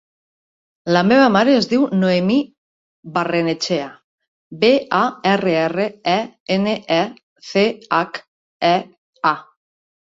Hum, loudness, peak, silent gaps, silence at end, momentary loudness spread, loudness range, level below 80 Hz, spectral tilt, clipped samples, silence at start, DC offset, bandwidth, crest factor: none; -18 LUFS; -2 dBFS; 2.58-3.03 s, 4.04-4.18 s, 4.28-4.51 s, 6.40-6.46 s, 7.23-7.36 s, 8.28-8.60 s, 8.98-9.13 s; 0.7 s; 10 LU; 4 LU; -60 dBFS; -5.5 dB/octave; under 0.1%; 0.85 s; under 0.1%; 7.8 kHz; 18 dB